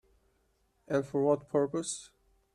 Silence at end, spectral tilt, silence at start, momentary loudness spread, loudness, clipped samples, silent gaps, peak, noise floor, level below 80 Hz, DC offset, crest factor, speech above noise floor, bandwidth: 0.5 s; -5.5 dB/octave; 0.9 s; 9 LU; -32 LUFS; under 0.1%; none; -14 dBFS; -73 dBFS; -70 dBFS; under 0.1%; 20 dB; 42 dB; 11.5 kHz